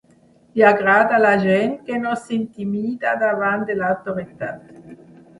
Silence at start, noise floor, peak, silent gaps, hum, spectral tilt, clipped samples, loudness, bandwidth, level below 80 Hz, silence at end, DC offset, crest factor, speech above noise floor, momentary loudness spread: 0.55 s; -54 dBFS; 0 dBFS; none; none; -7 dB/octave; under 0.1%; -19 LUFS; 11.5 kHz; -60 dBFS; 0.45 s; under 0.1%; 18 dB; 35 dB; 14 LU